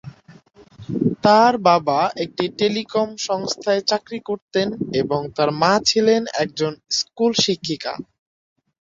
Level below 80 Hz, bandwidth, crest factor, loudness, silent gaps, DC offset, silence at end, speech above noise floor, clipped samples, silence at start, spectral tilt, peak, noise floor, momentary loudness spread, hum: -58 dBFS; 7.8 kHz; 18 dB; -20 LUFS; 4.42-4.48 s; under 0.1%; 0.8 s; 29 dB; under 0.1%; 0.05 s; -4 dB/octave; -2 dBFS; -48 dBFS; 10 LU; none